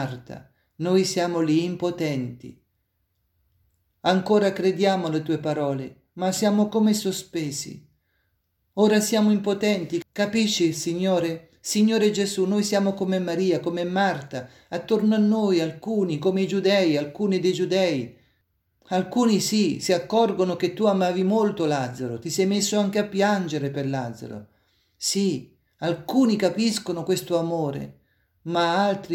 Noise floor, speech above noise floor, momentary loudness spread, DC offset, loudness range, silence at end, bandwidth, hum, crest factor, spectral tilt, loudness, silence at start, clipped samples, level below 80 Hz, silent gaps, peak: -73 dBFS; 50 dB; 11 LU; under 0.1%; 4 LU; 0 s; 16.5 kHz; none; 16 dB; -5 dB/octave; -23 LUFS; 0 s; under 0.1%; -66 dBFS; none; -8 dBFS